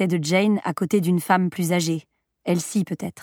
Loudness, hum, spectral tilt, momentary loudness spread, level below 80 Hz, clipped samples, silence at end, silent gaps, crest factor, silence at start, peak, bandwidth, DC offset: -22 LUFS; none; -5.5 dB/octave; 7 LU; -70 dBFS; under 0.1%; 0 s; none; 18 dB; 0 s; -6 dBFS; 18 kHz; under 0.1%